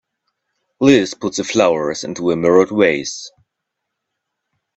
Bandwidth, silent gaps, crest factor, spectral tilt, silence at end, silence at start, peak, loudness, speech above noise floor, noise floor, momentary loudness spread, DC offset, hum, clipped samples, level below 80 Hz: 8.2 kHz; none; 18 dB; -4.5 dB/octave; 1.5 s; 0.8 s; 0 dBFS; -16 LUFS; 63 dB; -78 dBFS; 11 LU; under 0.1%; none; under 0.1%; -56 dBFS